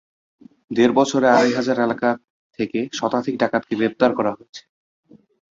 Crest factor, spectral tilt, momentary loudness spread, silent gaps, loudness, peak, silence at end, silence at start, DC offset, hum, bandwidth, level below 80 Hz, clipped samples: 18 dB; -5 dB/octave; 12 LU; 2.30-2.50 s, 4.49-4.53 s; -20 LUFS; -2 dBFS; 1 s; 0.7 s; under 0.1%; none; 7.8 kHz; -62 dBFS; under 0.1%